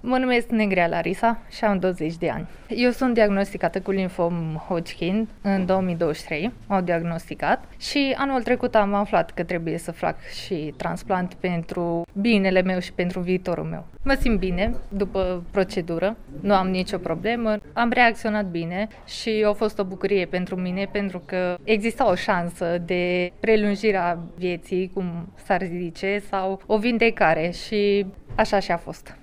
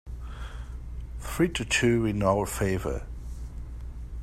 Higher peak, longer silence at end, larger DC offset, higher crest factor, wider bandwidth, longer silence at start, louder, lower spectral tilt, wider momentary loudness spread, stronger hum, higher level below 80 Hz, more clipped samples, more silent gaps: first, -4 dBFS vs -8 dBFS; about the same, 0.05 s vs 0 s; neither; about the same, 20 dB vs 20 dB; about the same, 15.5 kHz vs 16 kHz; about the same, 0.05 s vs 0.05 s; first, -24 LUFS vs -27 LUFS; first, -6.5 dB/octave vs -5 dB/octave; second, 8 LU vs 17 LU; neither; about the same, -40 dBFS vs -38 dBFS; neither; neither